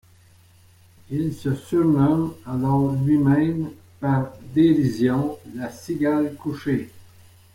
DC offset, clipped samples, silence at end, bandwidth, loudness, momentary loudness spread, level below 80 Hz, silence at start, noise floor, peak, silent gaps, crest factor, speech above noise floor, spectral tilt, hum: under 0.1%; under 0.1%; 0.55 s; 16 kHz; -22 LUFS; 12 LU; -54 dBFS; 1.1 s; -53 dBFS; -6 dBFS; none; 16 dB; 32 dB; -8.5 dB/octave; none